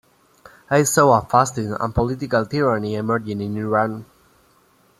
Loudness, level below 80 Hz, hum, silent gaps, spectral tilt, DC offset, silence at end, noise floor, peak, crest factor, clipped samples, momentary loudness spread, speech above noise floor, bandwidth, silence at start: -20 LUFS; -46 dBFS; none; none; -5.5 dB/octave; under 0.1%; 0.95 s; -57 dBFS; -2 dBFS; 20 dB; under 0.1%; 10 LU; 38 dB; 15.5 kHz; 0.7 s